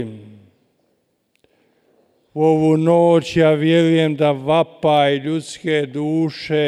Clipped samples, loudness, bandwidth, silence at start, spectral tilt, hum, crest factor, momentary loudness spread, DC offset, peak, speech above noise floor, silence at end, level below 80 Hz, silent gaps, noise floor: under 0.1%; -16 LUFS; 11 kHz; 0 s; -7 dB/octave; none; 14 dB; 8 LU; under 0.1%; -4 dBFS; 50 dB; 0 s; -56 dBFS; none; -66 dBFS